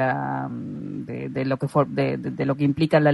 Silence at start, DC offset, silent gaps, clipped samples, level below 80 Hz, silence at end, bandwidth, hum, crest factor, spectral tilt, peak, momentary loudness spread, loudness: 0 s; under 0.1%; none; under 0.1%; -58 dBFS; 0 s; 11.5 kHz; none; 18 dB; -8.5 dB/octave; -4 dBFS; 12 LU; -25 LUFS